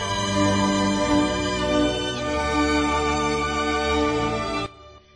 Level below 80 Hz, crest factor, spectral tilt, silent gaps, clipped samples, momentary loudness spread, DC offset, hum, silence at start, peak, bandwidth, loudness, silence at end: -38 dBFS; 14 dB; -4.5 dB/octave; none; under 0.1%; 5 LU; under 0.1%; none; 0 s; -8 dBFS; 10.5 kHz; -22 LUFS; 0.15 s